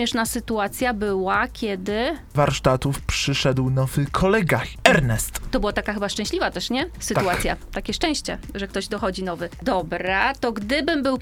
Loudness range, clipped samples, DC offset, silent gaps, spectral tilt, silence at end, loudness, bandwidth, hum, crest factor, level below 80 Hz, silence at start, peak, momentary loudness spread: 4 LU; under 0.1%; under 0.1%; none; -4.5 dB/octave; 0 s; -23 LUFS; 18.5 kHz; none; 22 dB; -36 dBFS; 0 s; 0 dBFS; 8 LU